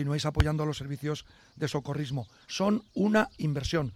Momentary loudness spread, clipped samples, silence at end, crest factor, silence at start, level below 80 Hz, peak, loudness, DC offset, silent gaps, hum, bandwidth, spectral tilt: 10 LU; under 0.1%; 0 s; 18 dB; 0 s; -44 dBFS; -12 dBFS; -30 LUFS; under 0.1%; none; none; 14 kHz; -6 dB/octave